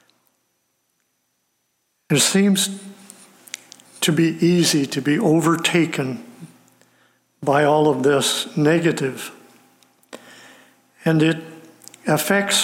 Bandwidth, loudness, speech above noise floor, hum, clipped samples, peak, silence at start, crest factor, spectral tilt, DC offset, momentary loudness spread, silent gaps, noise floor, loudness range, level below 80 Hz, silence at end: 17 kHz; -19 LUFS; 52 dB; none; under 0.1%; -4 dBFS; 2.1 s; 16 dB; -4 dB/octave; under 0.1%; 20 LU; none; -70 dBFS; 3 LU; -68 dBFS; 0 s